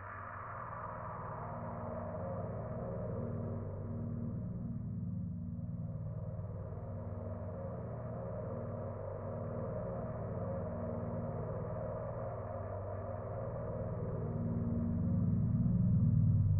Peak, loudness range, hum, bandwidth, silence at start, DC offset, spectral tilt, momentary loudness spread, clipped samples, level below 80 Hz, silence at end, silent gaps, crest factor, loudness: -20 dBFS; 6 LU; none; 2.6 kHz; 0 s; under 0.1%; -9 dB/octave; 10 LU; under 0.1%; -52 dBFS; 0 s; none; 16 dB; -39 LUFS